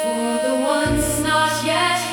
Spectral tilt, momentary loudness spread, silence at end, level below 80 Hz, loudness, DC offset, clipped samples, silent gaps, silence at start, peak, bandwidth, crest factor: -3.5 dB/octave; 3 LU; 0 s; -38 dBFS; -19 LUFS; under 0.1%; under 0.1%; none; 0 s; -6 dBFS; 17.5 kHz; 14 dB